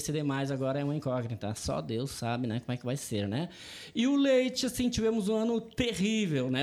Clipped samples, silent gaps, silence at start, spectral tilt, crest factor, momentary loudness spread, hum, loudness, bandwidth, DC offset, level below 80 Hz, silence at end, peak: under 0.1%; none; 0 s; -5.5 dB/octave; 16 dB; 8 LU; none; -31 LUFS; 15.5 kHz; under 0.1%; -54 dBFS; 0 s; -16 dBFS